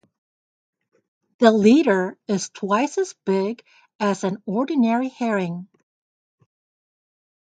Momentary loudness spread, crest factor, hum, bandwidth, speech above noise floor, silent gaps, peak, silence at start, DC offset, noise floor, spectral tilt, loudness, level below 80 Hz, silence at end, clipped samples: 11 LU; 22 dB; none; 9.2 kHz; over 70 dB; 3.95-3.99 s; 0 dBFS; 1.4 s; under 0.1%; under -90 dBFS; -5.5 dB/octave; -21 LUFS; -70 dBFS; 1.9 s; under 0.1%